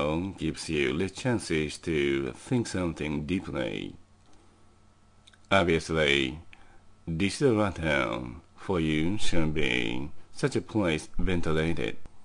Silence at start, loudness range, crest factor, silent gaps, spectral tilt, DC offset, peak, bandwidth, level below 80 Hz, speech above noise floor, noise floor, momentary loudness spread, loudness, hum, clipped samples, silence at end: 0 s; 4 LU; 20 dB; none; -5.5 dB/octave; under 0.1%; -8 dBFS; 10.5 kHz; -44 dBFS; 32 dB; -58 dBFS; 10 LU; -29 LUFS; none; under 0.1%; 0 s